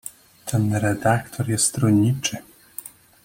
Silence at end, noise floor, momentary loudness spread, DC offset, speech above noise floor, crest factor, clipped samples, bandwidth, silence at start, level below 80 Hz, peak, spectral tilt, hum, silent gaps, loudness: 0.35 s; -41 dBFS; 19 LU; under 0.1%; 21 dB; 18 dB; under 0.1%; 17 kHz; 0.05 s; -54 dBFS; -6 dBFS; -5 dB/octave; none; none; -21 LUFS